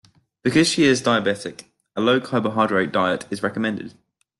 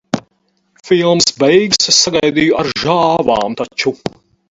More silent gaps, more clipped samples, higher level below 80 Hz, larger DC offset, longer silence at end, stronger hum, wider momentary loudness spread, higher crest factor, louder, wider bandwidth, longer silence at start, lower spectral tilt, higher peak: neither; neither; second, -60 dBFS vs -48 dBFS; neither; about the same, 0.5 s vs 0.4 s; neither; first, 14 LU vs 11 LU; about the same, 16 dB vs 14 dB; second, -20 LUFS vs -12 LUFS; first, 12 kHz vs 8 kHz; first, 0.45 s vs 0.15 s; first, -4.5 dB/octave vs -3 dB/octave; second, -4 dBFS vs 0 dBFS